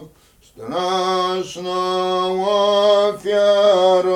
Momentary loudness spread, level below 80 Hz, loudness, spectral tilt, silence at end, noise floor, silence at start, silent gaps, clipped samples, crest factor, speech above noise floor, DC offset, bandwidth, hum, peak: 10 LU; -58 dBFS; -17 LUFS; -4.5 dB/octave; 0 s; -51 dBFS; 0 s; none; under 0.1%; 14 dB; 33 dB; under 0.1%; 12.5 kHz; none; -4 dBFS